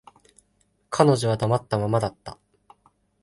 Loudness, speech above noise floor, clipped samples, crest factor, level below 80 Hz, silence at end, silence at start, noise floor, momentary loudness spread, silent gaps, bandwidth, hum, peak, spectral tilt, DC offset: -23 LUFS; 45 dB; under 0.1%; 22 dB; -54 dBFS; 0.9 s; 0.9 s; -67 dBFS; 17 LU; none; 11.5 kHz; none; -2 dBFS; -6.5 dB/octave; under 0.1%